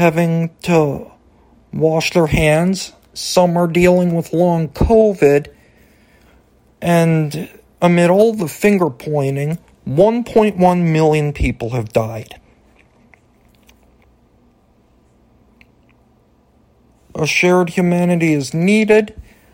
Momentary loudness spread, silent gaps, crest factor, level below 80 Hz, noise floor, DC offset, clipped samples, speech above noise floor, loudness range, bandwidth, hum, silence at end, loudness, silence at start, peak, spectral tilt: 11 LU; none; 16 dB; -36 dBFS; -54 dBFS; under 0.1%; under 0.1%; 40 dB; 6 LU; 16.5 kHz; none; 0.35 s; -15 LUFS; 0 s; 0 dBFS; -6.5 dB/octave